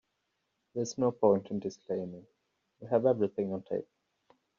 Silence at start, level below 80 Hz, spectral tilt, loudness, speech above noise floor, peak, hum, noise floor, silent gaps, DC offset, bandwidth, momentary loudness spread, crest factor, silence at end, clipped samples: 0.75 s; -76 dBFS; -7.5 dB/octave; -32 LUFS; 50 dB; -12 dBFS; none; -81 dBFS; none; under 0.1%; 7.4 kHz; 15 LU; 20 dB; 0.75 s; under 0.1%